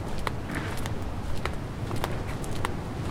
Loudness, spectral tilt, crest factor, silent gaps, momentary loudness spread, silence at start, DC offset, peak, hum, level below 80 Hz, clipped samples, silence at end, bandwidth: -33 LUFS; -5.5 dB/octave; 24 dB; none; 2 LU; 0 s; under 0.1%; -6 dBFS; none; -38 dBFS; under 0.1%; 0 s; 17 kHz